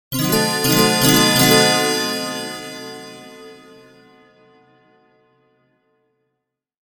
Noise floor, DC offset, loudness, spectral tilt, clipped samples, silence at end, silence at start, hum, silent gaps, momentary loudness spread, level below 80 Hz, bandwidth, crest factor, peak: -77 dBFS; under 0.1%; -15 LUFS; -3 dB/octave; under 0.1%; 3.4 s; 0.1 s; none; none; 22 LU; -52 dBFS; 19 kHz; 20 dB; 0 dBFS